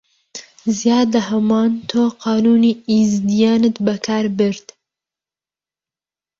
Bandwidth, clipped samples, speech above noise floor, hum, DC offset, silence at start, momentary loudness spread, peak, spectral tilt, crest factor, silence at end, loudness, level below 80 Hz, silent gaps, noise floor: 7.4 kHz; under 0.1%; over 75 dB; none; under 0.1%; 0.35 s; 10 LU; -4 dBFS; -5.5 dB/octave; 14 dB; 1.8 s; -16 LUFS; -58 dBFS; none; under -90 dBFS